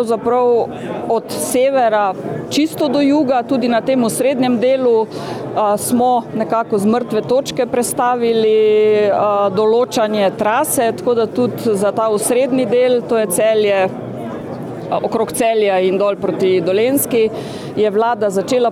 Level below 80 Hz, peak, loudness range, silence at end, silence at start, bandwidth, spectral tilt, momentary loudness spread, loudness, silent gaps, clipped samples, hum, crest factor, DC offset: -56 dBFS; -4 dBFS; 2 LU; 0 s; 0 s; 17 kHz; -4.5 dB/octave; 6 LU; -15 LUFS; none; under 0.1%; none; 10 dB; under 0.1%